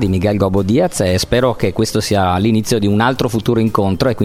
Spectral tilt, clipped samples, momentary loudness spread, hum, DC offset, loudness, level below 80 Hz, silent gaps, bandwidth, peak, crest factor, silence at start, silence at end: -6 dB/octave; under 0.1%; 2 LU; none; under 0.1%; -15 LUFS; -38 dBFS; none; 16 kHz; 0 dBFS; 14 dB; 0 s; 0 s